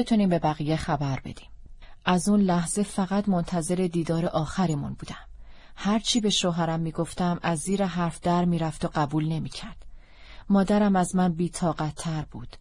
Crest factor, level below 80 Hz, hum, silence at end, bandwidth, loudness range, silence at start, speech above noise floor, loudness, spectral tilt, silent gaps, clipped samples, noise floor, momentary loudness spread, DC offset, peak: 18 dB; -46 dBFS; none; 0.05 s; 11.5 kHz; 2 LU; 0 s; 20 dB; -26 LUFS; -5.5 dB/octave; none; under 0.1%; -45 dBFS; 11 LU; under 0.1%; -8 dBFS